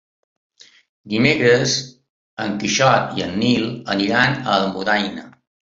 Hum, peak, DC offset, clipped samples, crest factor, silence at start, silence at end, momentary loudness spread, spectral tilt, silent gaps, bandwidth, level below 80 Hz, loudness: none; -2 dBFS; under 0.1%; under 0.1%; 18 dB; 1.05 s; 0.5 s; 12 LU; -4 dB/octave; 2.09-2.37 s; 7.8 kHz; -54 dBFS; -18 LUFS